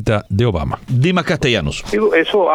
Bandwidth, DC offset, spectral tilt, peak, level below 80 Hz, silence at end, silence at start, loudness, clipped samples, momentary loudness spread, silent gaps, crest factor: 12.5 kHz; under 0.1%; -6 dB/octave; -2 dBFS; -34 dBFS; 0 s; 0 s; -16 LUFS; under 0.1%; 6 LU; none; 14 dB